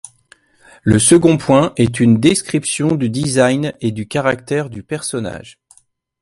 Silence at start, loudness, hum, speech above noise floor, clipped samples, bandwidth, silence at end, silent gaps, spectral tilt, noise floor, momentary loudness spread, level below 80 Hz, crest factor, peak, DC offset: 0.85 s; -15 LUFS; none; 38 dB; under 0.1%; 11.5 kHz; 0.7 s; none; -5 dB/octave; -53 dBFS; 12 LU; -46 dBFS; 16 dB; 0 dBFS; under 0.1%